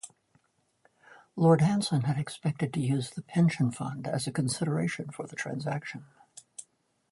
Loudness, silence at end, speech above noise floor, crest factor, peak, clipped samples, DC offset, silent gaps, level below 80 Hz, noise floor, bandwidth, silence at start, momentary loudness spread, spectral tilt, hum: -29 LUFS; 0.5 s; 41 dB; 22 dB; -8 dBFS; under 0.1%; under 0.1%; none; -68 dBFS; -70 dBFS; 11.5 kHz; 0.05 s; 21 LU; -6 dB/octave; none